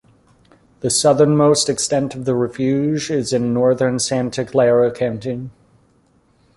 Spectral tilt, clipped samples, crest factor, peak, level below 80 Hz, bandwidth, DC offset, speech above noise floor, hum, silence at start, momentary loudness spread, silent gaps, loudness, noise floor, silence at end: -5 dB/octave; under 0.1%; 16 dB; -2 dBFS; -54 dBFS; 11.5 kHz; under 0.1%; 40 dB; none; 0.85 s; 10 LU; none; -17 LUFS; -57 dBFS; 1.05 s